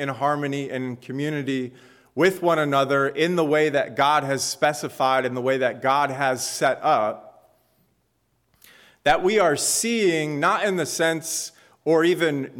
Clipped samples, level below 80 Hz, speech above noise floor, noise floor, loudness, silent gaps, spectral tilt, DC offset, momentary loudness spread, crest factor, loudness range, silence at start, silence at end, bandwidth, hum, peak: under 0.1%; -58 dBFS; 47 dB; -69 dBFS; -22 LUFS; none; -3.5 dB/octave; under 0.1%; 9 LU; 16 dB; 3 LU; 0 s; 0 s; 18.5 kHz; none; -8 dBFS